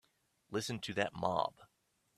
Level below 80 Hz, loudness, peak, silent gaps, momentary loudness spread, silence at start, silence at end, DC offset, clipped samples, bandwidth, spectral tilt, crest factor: -72 dBFS; -38 LUFS; -16 dBFS; none; 6 LU; 0.5 s; 0.5 s; under 0.1%; under 0.1%; 14 kHz; -4.5 dB/octave; 24 dB